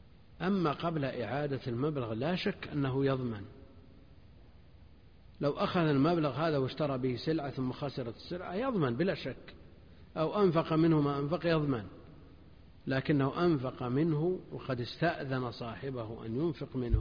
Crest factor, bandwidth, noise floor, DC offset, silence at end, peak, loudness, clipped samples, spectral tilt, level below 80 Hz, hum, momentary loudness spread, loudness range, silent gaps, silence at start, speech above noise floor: 18 dB; 5.2 kHz; -58 dBFS; under 0.1%; 0 s; -16 dBFS; -33 LUFS; under 0.1%; -9 dB/octave; -50 dBFS; none; 11 LU; 4 LU; none; 0.3 s; 26 dB